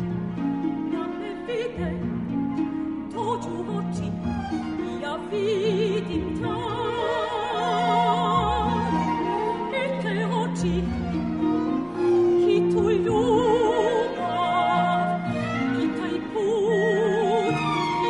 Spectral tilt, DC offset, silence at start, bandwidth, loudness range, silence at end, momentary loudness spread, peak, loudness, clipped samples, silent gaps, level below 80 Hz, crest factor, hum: -6.5 dB/octave; under 0.1%; 0 s; 10.5 kHz; 7 LU; 0 s; 8 LU; -10 dBFS; -24 LUFS; under 0.1%; none; -46 dBFS; 14 dB; none